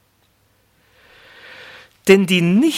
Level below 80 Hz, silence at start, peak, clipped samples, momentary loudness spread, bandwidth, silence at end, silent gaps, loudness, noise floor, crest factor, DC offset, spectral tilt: -62 dBFS; 2.05 s; 0 dBFS; under 0.1%; 26 LU; 16 kHz; 0 s; none; -14 LUFS; -60 dBFS; 18 dB; under 0.1%; -5.5 dB/octave